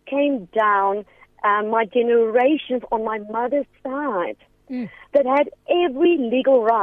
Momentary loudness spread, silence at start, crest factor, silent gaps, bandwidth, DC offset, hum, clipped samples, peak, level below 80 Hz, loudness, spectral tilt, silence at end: 12 LU; 0.05 s; 14 dB; none; 4.5 kHz; under 0.1%; none; under 0.1%; -6 dBFS; -60 dBFS; -20 LUFS; -7.5 dB/octave; 0 s